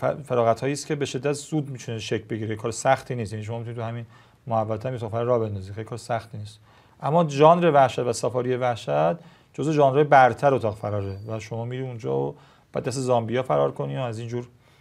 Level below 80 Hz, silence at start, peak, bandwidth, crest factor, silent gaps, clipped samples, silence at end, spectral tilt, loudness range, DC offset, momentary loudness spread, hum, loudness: -64 dBFS; 0 s; -2 dBFS; 13.5 kHz; 22 dB; none; under 0.1%; 0.35 s; -6 dB/octave; 8 LU; under 0.1%; 16 LU; none; -24 LUFS